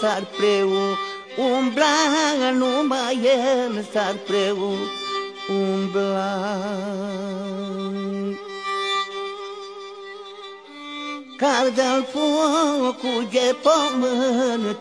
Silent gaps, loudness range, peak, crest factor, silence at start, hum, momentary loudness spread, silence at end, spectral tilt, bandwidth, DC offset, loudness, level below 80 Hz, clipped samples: none; 8 LU; -4 dBFS; 18 dB; 0 s; none; 14 LU; 0 s; -4 dB/octave; 10.5 kHz; under 0.1%; -22 LUFS; -74 dBFS; under 0.1%